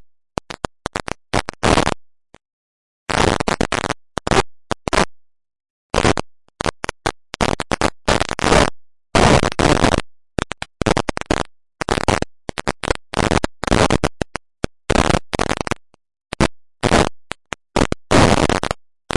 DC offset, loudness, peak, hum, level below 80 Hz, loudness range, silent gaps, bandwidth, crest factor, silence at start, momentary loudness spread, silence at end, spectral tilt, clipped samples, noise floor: under 0.1%; -19 LUFS; 0 dBFS; none; -32 dBFS; 5 LU; 2.53-3.06 s, 5.70-5.90 s; 11.5 kHz; 18 dB; 0.5 s; 14 LU; 0.4 s; -4.5 dB/octave; under 0.1%; under -90 dBFS